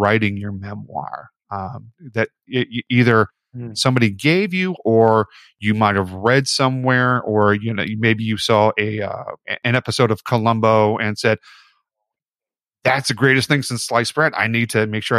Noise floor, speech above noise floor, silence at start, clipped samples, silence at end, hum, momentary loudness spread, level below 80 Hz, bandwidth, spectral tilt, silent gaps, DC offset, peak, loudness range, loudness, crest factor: under -90 dBFS; over 72 dB; 0 s; under 0.1%; 0 s; none; 13 LU; -58 dBFS; 14 kHz; -5.5 dB/octave; none; under 0.1%; -2 dBFS; 3 LU; -18 LUFS; 18 dB